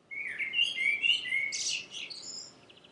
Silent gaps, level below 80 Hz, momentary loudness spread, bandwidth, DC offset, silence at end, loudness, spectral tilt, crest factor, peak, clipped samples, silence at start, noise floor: none; -82 dBFS; 15 LU; 11.5 kHz; under 0.1%; 0.2 s; -29 LUFS; 2 dB/octave; 18 dB; -16 dBFS; under 0.1%; 0.1 s; -53 dBFS